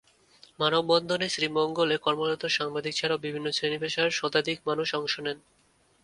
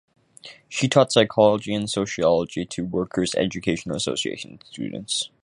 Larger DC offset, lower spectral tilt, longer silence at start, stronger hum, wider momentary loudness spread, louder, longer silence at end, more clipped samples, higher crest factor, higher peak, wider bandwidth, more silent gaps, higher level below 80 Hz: neither; about the same, -3.5 dB/octave vs -4.5 dB/octave; first, 0.6 s vs 0.45 s; neither; second, 5 LU vs 15 LU; second, -27 LUFS vs -23 LUFS; first, 0.65 s vs 0.15 s; neither; about the same, 20 dB vs 22 dB; second, -8 dBFS vs -2 dBFS; about the same, 11.5 kHz vs 11.5 kHz; neither; second, -70 dBFS vs -54 dBFS